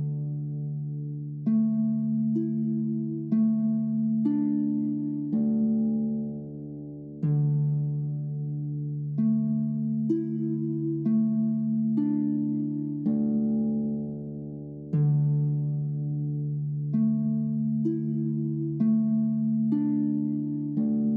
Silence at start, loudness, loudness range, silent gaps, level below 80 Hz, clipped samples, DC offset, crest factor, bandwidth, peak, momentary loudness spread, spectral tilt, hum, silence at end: 0 s; -27 LUFS; 2 LU; none; -62 dBFS; under 0.1%; under 0.1%; 12 dB; 1.9 kHz; -14 dBFS; 8 LU; -14.5 dB/octave; none; 0 s